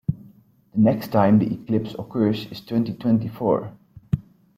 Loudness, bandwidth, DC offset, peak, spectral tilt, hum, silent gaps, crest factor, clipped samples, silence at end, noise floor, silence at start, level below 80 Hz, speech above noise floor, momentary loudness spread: -23 LUFS; 15 kHz; under 0.1%; -4 dBFS; -9 dB/octave; none; none; 18 dB; under 0.1%; 0.35 s; -52 dBFS; 0.1 s; -50 dBFS; 31 dB; 12 LU